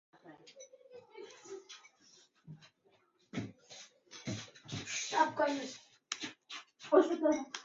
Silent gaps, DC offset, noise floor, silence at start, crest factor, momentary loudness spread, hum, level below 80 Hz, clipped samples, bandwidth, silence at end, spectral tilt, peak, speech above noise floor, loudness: none; under 0.1%; -72 dBFS; 0.25 s; 26 dB; 26 LU; none; -74 dBFS; under 0.1%; 7.6 kHz; 0 s; -3.5 dB/octave; -12 dBFS; 41 dB; -35 LUFS